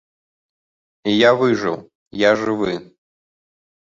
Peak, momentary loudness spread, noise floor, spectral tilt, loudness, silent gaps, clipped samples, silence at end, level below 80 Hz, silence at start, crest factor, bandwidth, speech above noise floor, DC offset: -2 dBFS; 16 LU; under -90 dBFS; -5.5 dB/octave; -18 LUFS; 1.95-2.11 s; under 0.1%; 1.1 s; -58 dBFS; 1.05 s; 20 dB; 7.6 kHz; over 73 dB; under 0.1%